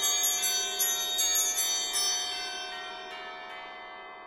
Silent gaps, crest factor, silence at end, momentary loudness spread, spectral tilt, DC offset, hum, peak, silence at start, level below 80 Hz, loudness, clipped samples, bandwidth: none; 16 dB; 0 s; 17 LU; 3 dB/octave; under 0.1%; none; -14 dBFS; 0 s; -68 dBFS; -26 LUFS; under 0.1%; 17 kHz